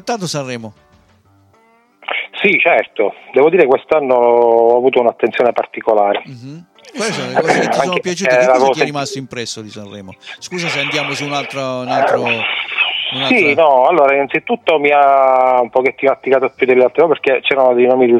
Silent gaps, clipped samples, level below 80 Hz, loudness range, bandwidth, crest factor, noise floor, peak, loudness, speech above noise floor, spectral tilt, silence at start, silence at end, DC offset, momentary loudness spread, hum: none; under 0.1%; -62 dBFS; 6 LU; 13 kHz; 14 dB; -52 dBFS; 0 dBFS; -13 LUFS; 39 dB; -4 dB/octave; 0.05 s; 0 s; under 0.1%; 14 LU; none